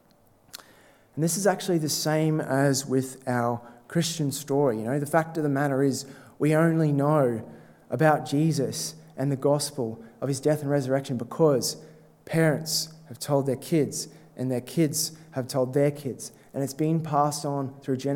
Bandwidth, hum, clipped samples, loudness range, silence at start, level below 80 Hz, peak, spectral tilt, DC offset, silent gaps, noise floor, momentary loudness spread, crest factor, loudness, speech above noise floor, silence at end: 17.5 kHz; none; under 0.1%; 3 LU; 0.55 s; -70 dBFS; -6 dBFS; -5.5 dB/octave; under 0.1%; none; -59 dBFS; 12 LU; 20 dB; -26 LUFS; 34 dB; 0 s